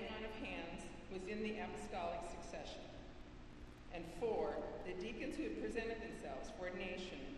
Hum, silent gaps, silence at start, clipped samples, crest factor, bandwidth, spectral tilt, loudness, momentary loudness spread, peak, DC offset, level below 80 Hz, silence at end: 60 Hz at -65 dBFS; none; 0 s; under 0.1%; 18 dB; 12.5 kHz; -5 dB/octave; -46 LUFS; 13 LU; -28 dBFS; under 0.1%; -58 dBFS; 0 s